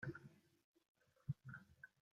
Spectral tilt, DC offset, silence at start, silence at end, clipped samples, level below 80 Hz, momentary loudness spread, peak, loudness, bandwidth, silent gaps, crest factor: -8.5 dB/octave; under 0.1%; 0 s; 0.25 s; under 0.1%; -78 dBFS; 13 LU; -34 dBFS; -55 LUFS; 13 kHz; 0.64-0.74 s, 0.88-0.95 s; 22 dB